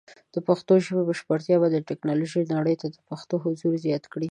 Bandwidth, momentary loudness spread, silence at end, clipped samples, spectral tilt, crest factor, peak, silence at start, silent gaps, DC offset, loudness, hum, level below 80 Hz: 10 kHz; 10 LU; 0 s; under 0.1%; -7.5 dB/octave; 18 dB; -6 dBFS; 0.35 s; none; under 0.1%; -25 LUFS; none; -72 dBFS